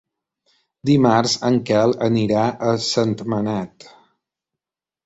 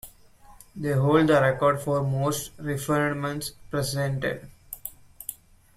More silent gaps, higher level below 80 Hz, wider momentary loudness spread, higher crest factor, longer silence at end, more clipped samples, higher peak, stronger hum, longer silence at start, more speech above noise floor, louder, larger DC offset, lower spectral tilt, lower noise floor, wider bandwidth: neither; about the same, -56 dBFS vs -52 dBFS; second, 9 LU vs 17 LU; about the same, 18 dB vs 18 dB; first, 1.4 s vs 0.4 s; neither; first, -4 dBFS vs -8 dBFS; neither; first, 0.85 s vs 0.05 s; first, 70 dB vs 27 dB; first, -19 LUFS vs -25 LUFS; neither; about the same, -5.5 dB/octave vs -5.5 dB/octave; first, -88 dBFS vs -52 dBFS; second, 8 kHz vs 16 kHz